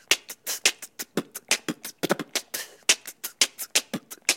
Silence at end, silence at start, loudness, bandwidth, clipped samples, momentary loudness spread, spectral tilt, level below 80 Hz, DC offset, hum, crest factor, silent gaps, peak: 0 s; 0.1 s; -26 LUFS; 17 kHz; under 0.1%; 11 LU; -0.5 dB/octave; -74 dBFS; under 0.1%; none; 26 dB; none; -2 dBFS